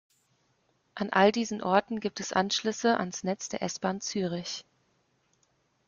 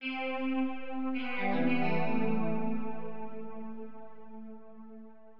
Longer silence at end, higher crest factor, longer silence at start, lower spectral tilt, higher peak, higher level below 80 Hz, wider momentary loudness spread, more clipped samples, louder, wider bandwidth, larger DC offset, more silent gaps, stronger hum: first, 1.25 s vs 0 s; first, 22 dB vs 16 dB; first, 0.95 s vs 0 s; second, -4 dB/octave vs -9 dB/octave; first, -8 dBFS vs -16 dBFS; first, -70 dBFS vs -80 dBFS; second, 12 LU vs 20 LU; neither; first, -29 LUFS vs -34 LUFS; first, 7.4 kHz vs 5.6 kHz; second, under 0.1% vs 2%; neither; neither